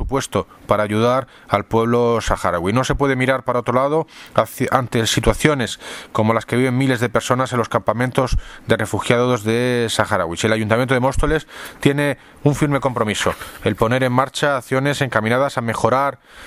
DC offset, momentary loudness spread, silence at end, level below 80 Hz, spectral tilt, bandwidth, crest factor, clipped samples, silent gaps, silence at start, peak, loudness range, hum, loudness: under 0.1%; 5 LU; 0 s; -34 dBFS; -5.5 dB/octave; 16 kHz; 18 dB; under 0.1%; none; 0 s; 0 dBFS; 1 LU; none; -19 LUFS